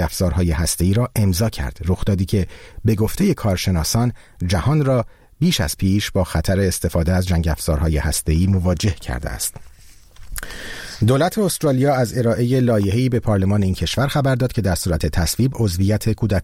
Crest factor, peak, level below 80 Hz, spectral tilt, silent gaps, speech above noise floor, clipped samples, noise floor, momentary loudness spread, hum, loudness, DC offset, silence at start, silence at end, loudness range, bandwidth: 14 dB; -4 dBFS; -30 dBFS; -5.5 dB/octave; none; 25 dB; under 0.1%; -43 dBFS; 7 LU; none; -19 LUFS; 0.2%; 0 s; 0 s; 4 LU; 16.5 kHz